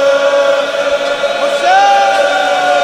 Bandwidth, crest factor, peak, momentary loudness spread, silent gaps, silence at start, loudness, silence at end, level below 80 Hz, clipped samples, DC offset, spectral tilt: 13 kHz; 10 dB; 0 dBFS; 6 LU; none; 0 s; -11 LUFS; 0 s; -54 dBFS; under 0.1%; under 0.1%; -1.5 dB/octave